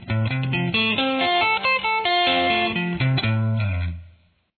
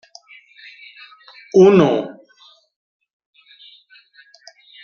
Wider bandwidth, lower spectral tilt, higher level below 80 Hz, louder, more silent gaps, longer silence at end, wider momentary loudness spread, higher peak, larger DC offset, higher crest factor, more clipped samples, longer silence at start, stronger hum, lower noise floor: second, 4.6 kHz vs 6.8 kHz; first, -8.5 dB/octave vs -7 dB/octave; first, -46 dBFS vs -62 dBFS; second, -20 LUFS vs -13 LUFS; neither; second, 0.5 s vs 2.75 s; second, 6 LU vs 28 LU; second, -8 dBFS vs -2 dBFS; neither; about the same, 14 dB vs 18 dB; neither; second, 0 s vs 1.55 s; neither; about the same, -54 dBFS vs -52 dBFS